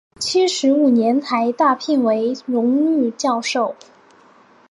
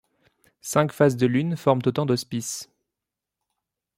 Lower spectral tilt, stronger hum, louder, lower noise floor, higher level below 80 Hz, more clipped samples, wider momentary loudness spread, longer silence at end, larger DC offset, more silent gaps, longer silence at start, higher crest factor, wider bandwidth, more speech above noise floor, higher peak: second, -3.5 dB/octave vs -5.5 dB/octave; neither; first, -18 LUFS vs -23 LUFS; second, -50 dBFS vs -87 dBFS; about the same, -68 dBFS vs -64 dBFS; neither; second, 6 LU vs 12 LU; second, 0.95 s vs 1.35 s; neither; neither; second, 0.2 s vs 0.65 s; second, 14 dB vs 22 dB; second, 11.5 kHz vs 16 kHz; second, 33 dB vs 64 dB; about the same, -4 dBFS vs -4 dBFS